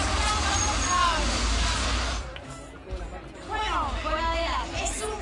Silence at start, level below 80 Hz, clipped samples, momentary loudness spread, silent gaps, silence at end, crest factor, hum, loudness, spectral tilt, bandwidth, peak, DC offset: 0 s; -32 dBFS; under 0.1%; 16 LU; none; 0 s; 16 dB; none; -26 LUFS; -3 dB/octave; 11.5 kHz; -12 dBFS; under 0.1%